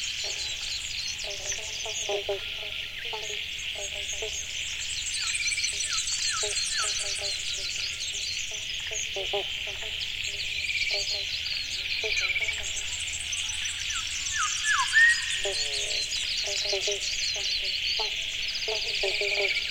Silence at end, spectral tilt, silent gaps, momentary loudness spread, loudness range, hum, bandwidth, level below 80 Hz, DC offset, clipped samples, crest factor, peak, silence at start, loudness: 0 s; 1 dB/octave; none; 6 LU; 6 LU; none; 16.5 kHz; -50 dBFS; under 0.1%; under 0.1%; 20 dB; -10 dBFS; 0 s; -27 LUFS